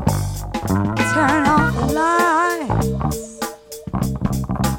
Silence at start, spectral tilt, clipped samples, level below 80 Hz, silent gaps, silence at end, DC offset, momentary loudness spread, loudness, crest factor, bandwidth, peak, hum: 0 s; -5.5 dB/octave; under 0.1%; -32 dBFS; none; 0 s; under 0.1%; 12 LU; -19 LUFS; 16 dB; 17 kHz; -2 dBFS; none